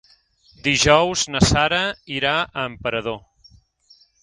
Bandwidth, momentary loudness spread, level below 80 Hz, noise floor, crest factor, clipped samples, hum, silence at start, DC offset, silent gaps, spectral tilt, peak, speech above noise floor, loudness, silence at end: 11.5 kHz; 11 LU; -38 dBFS; -56 dBFS; 20 dB; under 0.1%; none; 0.65 s; under 0.1%; none; -3.5 dB/octave; 0 dBFS; 36 dB; -19 LUFS; 1.05 s